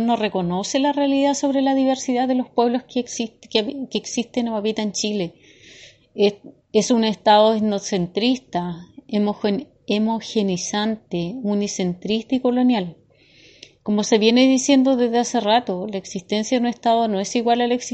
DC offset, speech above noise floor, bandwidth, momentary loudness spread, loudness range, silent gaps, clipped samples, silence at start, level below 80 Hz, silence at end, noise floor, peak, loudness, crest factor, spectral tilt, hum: under 0.1%; 32 dB; 8.6 kHz; 11 LU; 5 LU; none; under 0.1%; 0 s; -62 dBFS; 0 s; -52 dBFS; -2 dBFS; -20 LUFS; 20 dB; -4.5 dB/octave; none